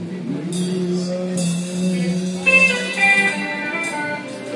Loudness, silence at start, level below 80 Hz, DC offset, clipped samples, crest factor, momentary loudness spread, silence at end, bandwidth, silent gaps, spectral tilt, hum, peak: -18 LUFS; 0 s; -66 dBFS; under 0.1%; under 0.1%; 16 dB; 12 LU; 0 s; 11.5 kHz; none; -4.5 dB/octave; none; -4 dBFS